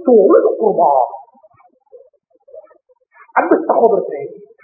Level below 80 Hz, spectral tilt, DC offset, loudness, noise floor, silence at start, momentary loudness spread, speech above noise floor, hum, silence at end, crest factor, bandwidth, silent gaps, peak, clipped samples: -72 dBFS; -12 dB/octave; under 0.1%; -13 LUFS; -53 dBFS; 0 s; 17 LU; 39 dB; none; 0.3 s; 16 dB; 2.6 kHz; none; 0 dBFS; under 0.1%